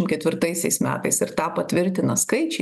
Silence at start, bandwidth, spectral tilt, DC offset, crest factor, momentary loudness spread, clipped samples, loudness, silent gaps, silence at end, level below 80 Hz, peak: 0 s; 13 kHz; -4 dB/octave; under 0.1%; 16 dB; 2 LU; under 0.1%; -22 LUFS; none; 0 s; -60 dBFS; -6 dBFS